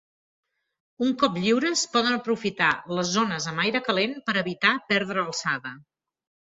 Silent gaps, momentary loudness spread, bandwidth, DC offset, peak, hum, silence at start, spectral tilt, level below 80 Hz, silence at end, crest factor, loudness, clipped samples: none; 5 LU; 8 kHz; under 0.1%; -4 dBFS; none; 1 s; -3.5 dB/octave; -66 dBFS; 0.7 s; 22 dB; -24 LUFS; under 0.1%